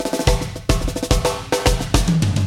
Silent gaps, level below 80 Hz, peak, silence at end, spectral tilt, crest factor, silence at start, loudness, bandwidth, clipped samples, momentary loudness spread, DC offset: none; -24 dBFS; 0 dBFS; 0 s; -5 dB/octave; 18 dB; 0 s; -20 LUFS; 17 kHz; under 0.1%; 4 LU; under 0.1%